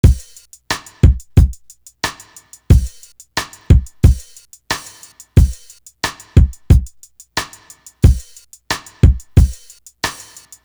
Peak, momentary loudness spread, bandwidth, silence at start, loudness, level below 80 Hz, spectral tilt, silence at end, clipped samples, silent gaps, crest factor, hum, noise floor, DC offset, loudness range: 0 dBFS; 16 LU; over 20 kHz; 0.05 s; -17 LUFS; -18 dBFS; -5.5 dB/octave; 0.5 s; under 0.1%; none; 16 dB; none; -43 dBFS; under 0.1%; 1 LU